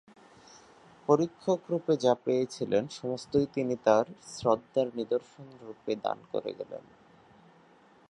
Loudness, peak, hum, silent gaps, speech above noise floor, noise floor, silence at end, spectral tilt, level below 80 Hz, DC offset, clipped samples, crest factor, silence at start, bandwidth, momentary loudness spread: -30 LUFS; -8 dBFS; none; none; 30 dB; -60 dBFS; 1.3 s; -6 dB/octave; -68 dBFS; under 0.1%; under 0.1%; 22 dB; 1.1 s; 11 kHz; 15 LU